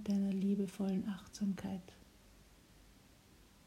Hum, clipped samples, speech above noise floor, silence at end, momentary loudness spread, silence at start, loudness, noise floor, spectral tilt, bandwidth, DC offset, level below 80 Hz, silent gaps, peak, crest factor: none; under 0.1%; 24 dB; 1.65 s; 11 LU; 0 s; -39 LUFS; -64 dBFS; -7.5 dB/octave; 14 kHz; under 0.1%; -66 dBFS; none; -26 dBFS; 16 dB